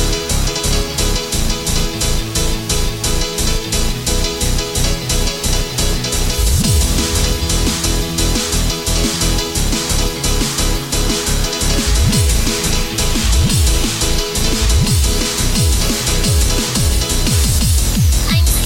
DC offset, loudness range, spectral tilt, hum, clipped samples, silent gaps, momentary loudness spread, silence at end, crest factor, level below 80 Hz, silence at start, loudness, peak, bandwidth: under 0.1%; 3 LU; -3.5 dB/octave; none; under 0.1%; none; 4 LU; 0 s; 12 dB; -18 dBFS; 0 s; -15 LUFS; -2 dBFS; 17 kHz